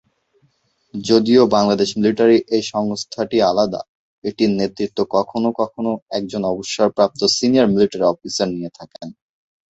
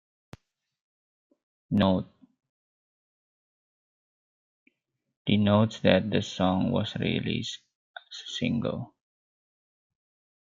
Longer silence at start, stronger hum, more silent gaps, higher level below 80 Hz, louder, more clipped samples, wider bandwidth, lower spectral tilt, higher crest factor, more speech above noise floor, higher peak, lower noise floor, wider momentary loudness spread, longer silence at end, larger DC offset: second, 0.95 s vs 1.7 s; neither; second, 3.89-4.22 s, 6.02-6.06 s vs 2.49-4.66 s, 5.17-5.25 s, 7.75-7.94 s; first, -56 dBFS vs -64 dBFS; first, -18 LUFS vs -27 LUFS; neither; about the same, 8.2 kHz vs 7.6 kHz; second, -5 dB/octave vs -6.5 dB/octave; second, 18 dB vs 24 dB; about the same, 45 dB vs 46 dB; first, -2 dBFS vs -6 dBFS; second, -62 dBFS vs -71 dBFS; about the same, 15 LU vs 17 LU; second, 0.6 s vs 1.65 s; neither